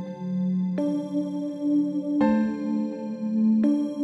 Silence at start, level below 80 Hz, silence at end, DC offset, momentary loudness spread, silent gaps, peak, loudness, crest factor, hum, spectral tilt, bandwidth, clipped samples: 0 s; -66 dBFS; 0 s; under 0.1%; 7 LU; none; -10 dBFS; -25 LUFS; 14 dB; none; -9 dB/octave; 8 kHz; under 0.1%